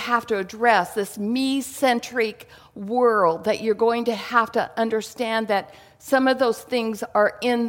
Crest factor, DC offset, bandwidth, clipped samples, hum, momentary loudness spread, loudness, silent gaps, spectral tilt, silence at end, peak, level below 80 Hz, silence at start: 18 dB; under 0.1%; 17 kHz; under 0.1%; none; 7 LU; -22 LUFS; none; -4 dB/octave; 0 s; -4 dBFS; -64 dBFS; 0 s